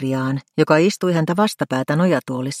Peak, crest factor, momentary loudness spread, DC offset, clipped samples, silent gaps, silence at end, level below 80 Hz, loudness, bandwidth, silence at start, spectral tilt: 0 dBFS; 18 dB; 7 LU; under 0.1%; under 0.1%; none; 0 s; -64 dBFS; -19 LUFS; 15.5 kHz; 0 s; -6 dB/octave